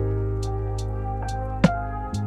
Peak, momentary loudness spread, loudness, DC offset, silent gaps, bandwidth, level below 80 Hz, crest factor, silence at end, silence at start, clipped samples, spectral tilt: -2 dBFS; 7 LU; -26 LUFS; under 0.1%; none; 11.5 kHz; -32 dBFS; 24 dB; 0 s; 0 s; under 0.1%; -7.5 dB/octave